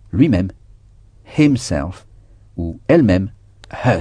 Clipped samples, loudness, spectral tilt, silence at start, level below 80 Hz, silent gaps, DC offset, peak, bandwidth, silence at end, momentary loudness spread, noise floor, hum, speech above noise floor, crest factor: under 0.1%; -17 LUFS; -7 dB/octave; 0.15 s; -38 dBFS; none; under 0.1%; 0 dBFS; 10 kHz; 0 s; 17 LU; -46 dBFS; none; 31 dB; 18 dB